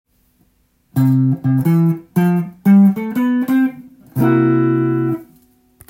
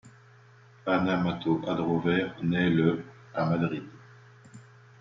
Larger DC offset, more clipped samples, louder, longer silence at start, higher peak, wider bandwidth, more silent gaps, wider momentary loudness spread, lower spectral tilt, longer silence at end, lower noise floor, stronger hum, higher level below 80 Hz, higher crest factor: neither; neither; first, -15 LUFS vs -28 LUFS; first, 0.95 s vs 0.05 s; first, -2 dBFS vs -10 dBFS; first, 16.5 kHz vs 7.6 kHz; neither; second, 9 LU vs 12 LU; first, -9.5 dB/octave vs -8 dB/octave; first, 0.65 s vs 0.4 s; first, -59 dBFS vs -55 dBFS; neither; about the same, -58 dBFS vs -62 dBFS; about the same, 14 dB vs 18 dB